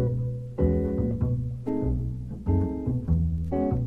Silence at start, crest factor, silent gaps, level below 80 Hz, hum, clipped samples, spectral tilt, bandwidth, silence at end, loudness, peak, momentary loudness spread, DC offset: 0 s; 14 dB; none; -32 dBFS; none; under 0.1%; -12 dB/octave; 3.2 kHz; 0 s; -28 LUFS; -12 dBFS; 5 LU; under 0.1%